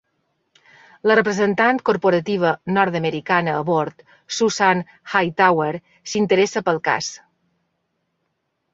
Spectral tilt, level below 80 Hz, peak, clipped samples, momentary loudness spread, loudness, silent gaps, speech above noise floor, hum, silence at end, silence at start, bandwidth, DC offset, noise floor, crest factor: -4.5 dB/octave; -64 dBFS; -2 dBFS; under 0.1%; 7 LU; -19 LUFS; none; 54 dB; none; 1.55 s; 1.05 s; 7.8 kHz; under 0.1%; -73 dBFS; 18 dB